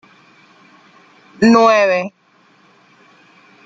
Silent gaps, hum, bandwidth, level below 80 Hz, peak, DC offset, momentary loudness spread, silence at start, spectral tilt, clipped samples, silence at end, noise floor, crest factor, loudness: none; none; 7.6 kHz; -62 dBFS; -2 dBFS; under 0.1%; 11 LU; 1.4 s; -5 dB/octave; under 0.1%; 1.55 s; -53 dBFS; 16 dB; -12 LUFS